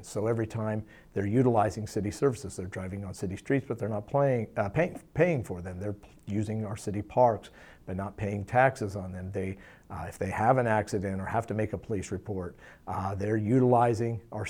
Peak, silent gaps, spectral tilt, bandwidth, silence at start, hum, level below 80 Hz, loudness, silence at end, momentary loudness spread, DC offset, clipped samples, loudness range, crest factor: -10 dBFS; none; -7.5 dB/octave; 15 kHz; 0 s; none; -56 dBFS; -30 LUFS; 0 s; 13 LU; under 0.1%; under 0.1%; 2 LU; 20 dB